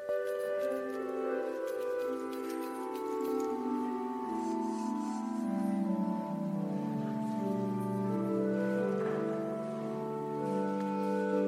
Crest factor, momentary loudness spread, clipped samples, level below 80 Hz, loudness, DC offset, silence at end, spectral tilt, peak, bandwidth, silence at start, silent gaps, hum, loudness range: 12 dB; 5 LU; under 0.1%; -78 dBFS; -35 LUFS; under 0.1%; 0 s; -7.5 dB/octave; -22 dBFS; 16 kHz; 0 s; none; none; 2 LU